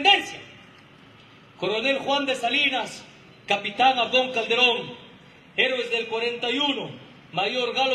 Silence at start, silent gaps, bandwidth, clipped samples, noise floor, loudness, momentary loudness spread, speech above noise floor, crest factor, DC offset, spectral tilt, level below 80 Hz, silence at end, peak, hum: 0 s; none; 13 kHz; under 0.1%; -50 dBFS; -23 LUFS; 18 LU; 27 dB; 20 dB; under 0.1%; -2.5 dB/octave; -68 dBFS; 0 s; -6 dBFS; none